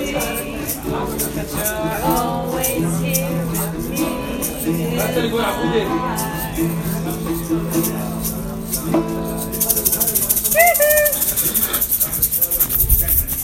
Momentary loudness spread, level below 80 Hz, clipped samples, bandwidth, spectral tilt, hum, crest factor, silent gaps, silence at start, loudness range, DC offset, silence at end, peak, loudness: 10 LU; -32 dBFS; under 0.1%; 17 kHz; -4 dB/octave; none; 20 dB; none; 0 s; 7 LU; under 0.1%; 0 s; 0 dBFS; -18 LUFS